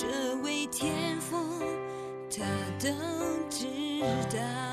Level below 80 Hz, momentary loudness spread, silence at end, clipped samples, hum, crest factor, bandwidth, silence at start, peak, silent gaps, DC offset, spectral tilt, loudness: -64 dBFS; 4 LU; 0 s; under 0.1%; none; 14 dB; 14 kHz; 0 s; -18 dBFS; none; under 0.1%; -4 dB/octave; -33 LUFS